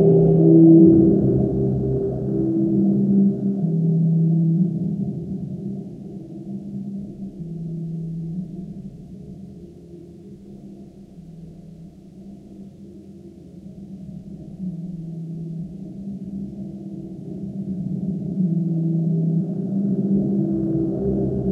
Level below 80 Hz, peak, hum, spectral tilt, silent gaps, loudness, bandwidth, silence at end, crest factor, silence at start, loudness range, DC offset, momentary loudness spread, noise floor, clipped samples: -46 dBFS; -2 dBFS; none; -13 dB/octave; none; -20 LUFS; 1.4 kHz; 0 s; 18 dB; 0 s; 22 LU; under 0.1%; 24 LU; -41 dBFS; under 0.1%